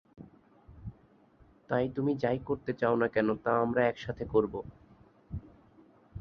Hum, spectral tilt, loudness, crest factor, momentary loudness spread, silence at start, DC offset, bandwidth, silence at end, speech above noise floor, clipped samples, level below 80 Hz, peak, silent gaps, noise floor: none; -8.5 dB/octave; -31 LUFS; 20 dB; 20 LU; 0.2 s; under 0.1%; 6.6 kHz; 0 s; 32 dB; under 0.1%; -56 dBFS; -14 dBFS; none; -62 dBFS